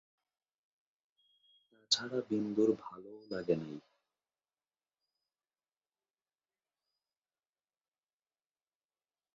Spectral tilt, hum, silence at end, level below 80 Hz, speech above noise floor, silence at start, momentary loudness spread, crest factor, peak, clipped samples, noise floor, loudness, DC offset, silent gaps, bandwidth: -4 dB/octave; none; 5.55 s; -82 dBFS; over 55 dB; 1.9 s; 18 LU; 26 dB; -16 dBFS; under 0.1%; under -90 dBFS; -35 LUFS; under 0.1%; none; 7.4 kHz